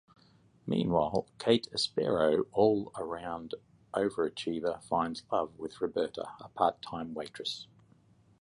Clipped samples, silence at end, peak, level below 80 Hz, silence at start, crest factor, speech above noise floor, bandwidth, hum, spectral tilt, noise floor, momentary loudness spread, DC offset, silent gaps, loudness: under 0.1%; 0.75 s; -12 dBFS; -62 dBFS; 0.65 s; 20 dB; 32 dB; 11.5 kHz; none; -5.5 dB/octave; -64 dBFS; 13 LU; under 0.1%; none; -32 LUFS